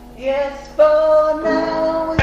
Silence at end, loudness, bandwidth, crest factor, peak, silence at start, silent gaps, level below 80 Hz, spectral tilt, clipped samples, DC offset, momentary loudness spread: 0 s; -16 LUFS; 7.6 kHz; 14 dB; -2 dBFS; 0 s; none; -42 dBFS; -6.5 dB/octave; under 0.1%; under 0.1%; 9 LU